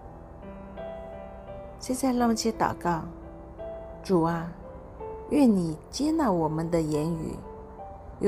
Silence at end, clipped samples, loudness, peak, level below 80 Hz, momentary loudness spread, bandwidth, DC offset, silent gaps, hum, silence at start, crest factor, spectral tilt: 0 s; under 0.1%; -27 LUFS; -10 dBFS; -48 dBFS; 19 LU; 15.5 kHz; under 0.1%; none; none; 0 s; 18 dB; -6 dB/octave